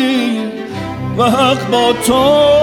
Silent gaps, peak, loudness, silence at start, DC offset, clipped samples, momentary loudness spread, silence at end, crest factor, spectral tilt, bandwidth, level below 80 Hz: none; 0 dBFS; -13 LUFS; 0 s; under 0.1%; under 0.1%; 12 LU; 0 s; 12 dB; -4.5 dB/octave; 19 kHz; -40 dBFS